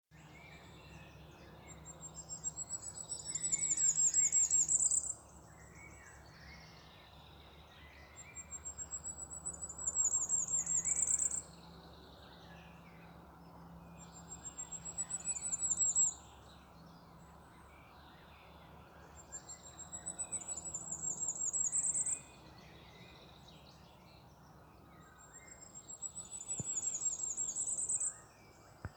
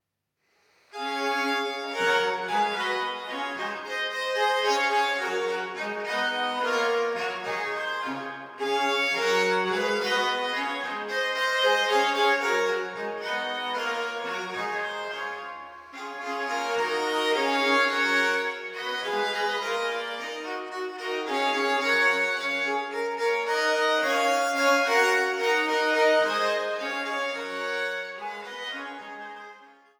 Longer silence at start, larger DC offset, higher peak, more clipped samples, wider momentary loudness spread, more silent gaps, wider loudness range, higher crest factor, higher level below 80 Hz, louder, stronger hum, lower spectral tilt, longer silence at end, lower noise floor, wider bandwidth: second, 0.15 s vs 0.95 s; neither; second, -20 dBFS vs -10 dBFS; neither; first, 27 LU vs 12 LU; neither; first, 20 LU vs 6 LU; about the same, 20 dB vs 18 dB; first, -66 dBFS vs -82 dBFS; second, -34 LUFS vs -26 LUFS; neither; about the same, -1 dB/octave vs -2 dB/octave; second, 0 s vs 0.3 s; second, -60 dBFS vs -77 dBFS; about the same, over 20 kHz vs over 20 kHz